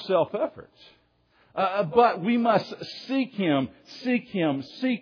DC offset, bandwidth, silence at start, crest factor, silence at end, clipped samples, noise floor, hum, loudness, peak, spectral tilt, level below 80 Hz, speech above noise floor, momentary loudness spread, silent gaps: under 0.1%; 5.4 kHz; 0 s; 20 dB; 0 s; under 0.1%; -63 dBFS; none; -25 LUFS; -6 dBFS; -7 dB/octave; -68 dBFS; 38 dB; 13 LU; none